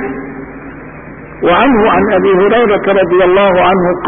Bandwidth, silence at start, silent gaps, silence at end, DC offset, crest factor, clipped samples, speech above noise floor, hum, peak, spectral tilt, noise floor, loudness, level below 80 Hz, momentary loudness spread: 3.7 kHz; 0 s; none; 0 s; under 0.1%; 10 dB; under 0.1%; 21 dB; none; 0 dBFS; -12 dB/octave; -29 dBFS; -9 LUFS; -36 dBFS; 21 LU